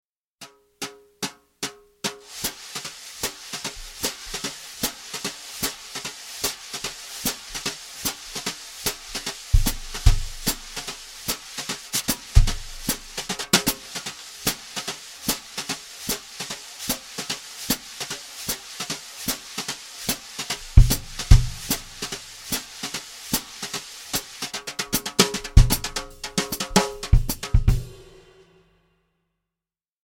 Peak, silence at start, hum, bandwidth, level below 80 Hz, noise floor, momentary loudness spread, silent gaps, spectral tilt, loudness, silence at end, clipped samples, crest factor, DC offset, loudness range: 0 dBFS; 0.4 s; none; 17 kHz; -28 dBFS; under -90 dBFS; 12 LU; none; -3.5 dB/octave; -26 LUFS; 2 s; under 0.1%; 24 dB; under 0.1%; 7 LU